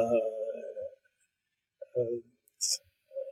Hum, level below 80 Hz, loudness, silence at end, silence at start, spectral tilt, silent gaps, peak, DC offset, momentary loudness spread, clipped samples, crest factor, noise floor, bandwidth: none; -82 dBFS; -34 LUFS; 0 s; 0 s; -3 dB/octave; none; -16 dBFS; under 0.1%; 14 LU; under 0.1%; 20 dB; -85 dBFS; 16 kHz